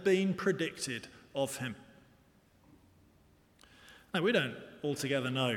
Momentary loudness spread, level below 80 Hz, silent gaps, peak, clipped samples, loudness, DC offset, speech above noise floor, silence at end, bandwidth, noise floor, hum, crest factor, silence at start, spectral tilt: 13 LU; -72 dBFS; none; -16 dBFS; under 0.1%; -34 LUFS; under 0.1%; 33 dB; 0 s; 18 kHz; -65 dBFS; none; 20 dB; 0 s; -4.5 dB/octave